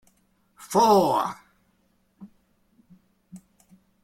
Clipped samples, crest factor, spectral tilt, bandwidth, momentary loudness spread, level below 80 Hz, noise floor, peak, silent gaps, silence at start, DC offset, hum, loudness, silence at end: under 0.1%; 20 dB; -5 dB/octave; 16.5 kHz; 15 LU; -66 dBFS; -67 dBFS; -6 dBFS; none; 0.6 s; under 0.1%; none; -21 LUFS; 0.65 s